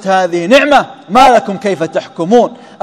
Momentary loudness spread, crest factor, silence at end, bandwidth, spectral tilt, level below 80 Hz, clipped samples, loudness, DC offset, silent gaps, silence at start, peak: 10 LU; 10 dB; 0.25 s; 15.5 kHz; -4.5 dB/octave; -42 dBFS; 3%; -10 LUFS; under 0.1%; none; 0 s; 0 dBFS